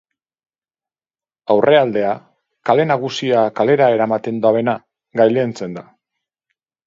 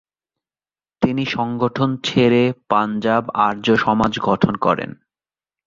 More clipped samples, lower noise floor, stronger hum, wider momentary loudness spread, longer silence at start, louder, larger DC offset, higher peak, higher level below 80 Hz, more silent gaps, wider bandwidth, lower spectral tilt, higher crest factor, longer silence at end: neither; about the same, under -90 dBFS vs under -90 dBFS; neither; first, 14 LU vs 6 LU; first, 1.5 s vs 1 s; about the same, -16 LUFS vs -18 LUFS; neither; about the same, 0 dBFS vs -2 dBFS; second, -66 dBFS vs -50 dBFS; neither; about the same, 7.6 kHz vs 7.6 kHz; about the same, -6.5 dB/octave vs -6.5 dB/octave; about the same, 18 dB vs 18 dB; first, 1.05 s vs 0.75 s